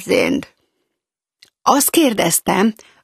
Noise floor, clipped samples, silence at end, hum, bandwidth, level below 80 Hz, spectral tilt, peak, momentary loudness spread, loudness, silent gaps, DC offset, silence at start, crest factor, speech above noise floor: -81 dBFS; under 0.1%; 0.3 s; none; 15 kHz; -56 dBFS; -3 dB/octave; 0 dBFS; 7 LU; -16 LUFS; none; under 0.1%; 0 s; 18 dB; 65 dB